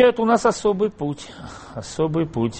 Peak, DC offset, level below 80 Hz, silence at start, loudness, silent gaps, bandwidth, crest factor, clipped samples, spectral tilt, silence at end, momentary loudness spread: -4 dBFS; under 0.1%; -50 dBFS; 0 s; -21 LUFS; none; 8.8 kHz; 16 dB; under 0.1%; -6 dB/octave; 0 s; 17 LU